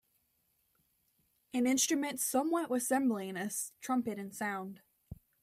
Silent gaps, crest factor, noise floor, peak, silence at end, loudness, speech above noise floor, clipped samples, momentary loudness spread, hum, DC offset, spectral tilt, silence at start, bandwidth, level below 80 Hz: none; 18 dB; -77 dBFS; -18 dBFS; 0.3 s; -34 LUFS; 43 dB; under 0.1%; 10 LU; none; under 0.1%; -3 dB/octave; 1.55 s; 16 kHz; -70 dBFS